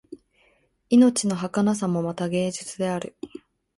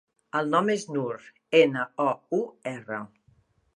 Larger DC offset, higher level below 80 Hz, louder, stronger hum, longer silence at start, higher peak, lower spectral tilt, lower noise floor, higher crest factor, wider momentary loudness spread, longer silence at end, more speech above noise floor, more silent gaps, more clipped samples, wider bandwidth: neither; first, -64 dBFS vs -76 dBFS; first, -23 LUFS vs -27 LUFS; neither; second, 0.1 s vs 0.35 s; about the same, -8 dBFS vs -6 dBFS; about the same, -5.5 dB/octave vs -5.5 dB/octave; about the same, -64 dBFS vs -64 dBFS; about the same, 18 dB vs 22 dB; about the same, 16 LU vs 15 LU; second, 0.4 s vs 0.7 s; first, 42 dB vs 38 dB; neither; neither; about the same, 11.5 kHz vs 11 kHz